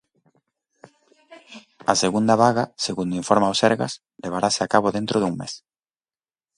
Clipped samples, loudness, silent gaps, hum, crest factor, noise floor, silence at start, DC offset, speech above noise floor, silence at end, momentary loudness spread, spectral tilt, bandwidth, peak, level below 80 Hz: under 0.1%; -21 LUFS; none; none; 22 dB; under -90 dBFS; 1.3 s; under 0.1%; over 69 dB; 1 s; 13 LU; -4 dB/octave; 11.5 kHz; 0 dBFS; -60 dBFS